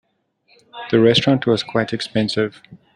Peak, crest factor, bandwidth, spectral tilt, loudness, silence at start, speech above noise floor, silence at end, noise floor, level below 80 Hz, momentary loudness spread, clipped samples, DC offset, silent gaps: -2 dBFS; 18 dB; 11.5 kHz; -6 dB/octave; -18 LUFS; 0.75 s; 44 dB; 0.2 s; -62 dBFS; -56 dBFS; 9 LU; under 0.1%; under 0.1%; none